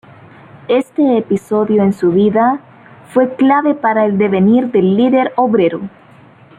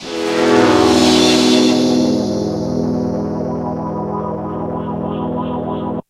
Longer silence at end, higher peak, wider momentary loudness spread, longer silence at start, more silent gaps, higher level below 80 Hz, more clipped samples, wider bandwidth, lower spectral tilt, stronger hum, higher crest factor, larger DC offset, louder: first, 0.7 s vs 0.1 s; about the same, -2 dBFS vs 0 dBFS; second, 5 LU vs 11 LU; first, 0.7 s vs 0 s; neither; second, -58 dBFS vs -42 dBFS; neither; second, 11 kHz vs 14 kHz; first, -8.5 dB/octave vs -4.5 dB/octave; neither; about the same, 12 dB vs 16 dB; neither; about the same, -13 LUFS vs -15 LUFS